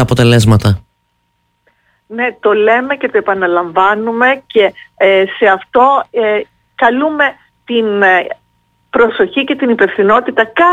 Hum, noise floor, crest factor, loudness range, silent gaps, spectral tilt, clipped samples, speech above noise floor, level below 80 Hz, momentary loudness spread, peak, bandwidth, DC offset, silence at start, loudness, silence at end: none; -62 dBFS; 12 dB; 3 LU; none; -6 dB/octave; under 0.1%; 52 dB; -42 dBFS; 8 LU; 0 dBFS; 15.5 kHz; under 0.1%; 0 s; -11 LUFS; 0 s